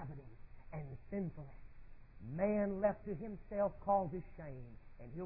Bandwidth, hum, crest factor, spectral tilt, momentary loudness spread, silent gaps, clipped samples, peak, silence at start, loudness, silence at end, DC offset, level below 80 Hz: 2.8 kHz; none; 20 dB; -10.5 dB/octave; 20 LU; none; under 0.1%; -22 dBFS; 0 s; -40 LUFS; 0 s; under 0.1%; -56 dBFS